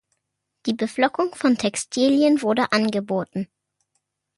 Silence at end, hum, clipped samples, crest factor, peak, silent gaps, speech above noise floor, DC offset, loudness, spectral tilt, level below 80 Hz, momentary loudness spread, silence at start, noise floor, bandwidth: 0.95 s; none; under 0.1%; 16 dB; -6 dBFS; none; 57 dB; under 0.1%; -22 LUFS; -4.5 dB/octave; -66 dBFS; 12 LU; 0.65 s; -78 dBFS; 11.5 kHz